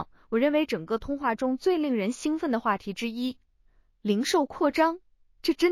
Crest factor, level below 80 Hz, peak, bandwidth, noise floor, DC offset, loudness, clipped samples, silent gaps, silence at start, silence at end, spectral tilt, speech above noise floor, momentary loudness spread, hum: 18 dB; -56 dBFS; -10 dBFS; 15 kHz; -63 dBFS; under 0.1%; -27 LUFS; under 0.1%; none; 0 s; 0 s; -4.5 dB/octave; 37 dB; 8 LU; none